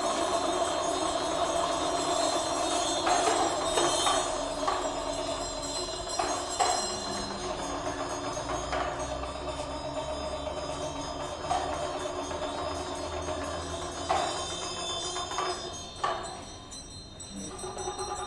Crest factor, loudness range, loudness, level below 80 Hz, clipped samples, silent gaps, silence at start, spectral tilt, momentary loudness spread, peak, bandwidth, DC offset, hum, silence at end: 18 dB; 7 LU; -31 LUFS; -50 dBFS; under 0.1%; none; 0 s; -2.5 dB/octave; 9 LU; -12 dBFS; 11.5 kHz; under 0.1%; none; 0 s